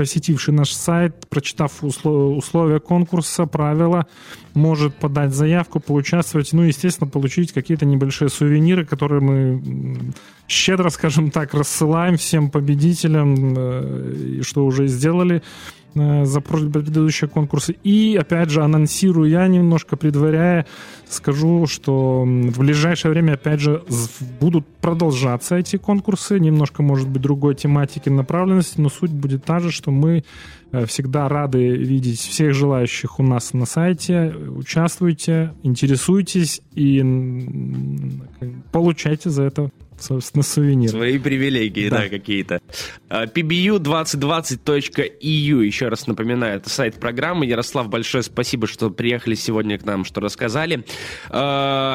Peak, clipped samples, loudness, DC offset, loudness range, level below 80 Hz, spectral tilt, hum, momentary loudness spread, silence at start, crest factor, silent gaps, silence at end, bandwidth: -2 dBFS; under 0.1%; -18 LUFS; under 0.1%; 4 LU; -50 dBFS; -6 dB/octave; none; 8 LU; 0 s; 16 dB; none; 0 s; 15.5 kHz